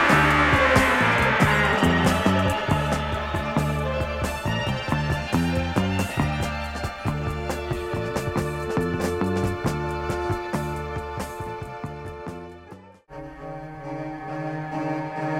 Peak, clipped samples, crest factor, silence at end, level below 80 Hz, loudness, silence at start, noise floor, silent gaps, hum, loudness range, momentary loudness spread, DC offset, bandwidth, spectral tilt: -6 dBFS; under 0.1%; 18 dB; 0 s; -38 dBFS; -24 LUFS; 0 s; -45 dBFS; none; none; 14 LU; 17 LU; under 0.1%; 16 kHz; -5.5 dB/octave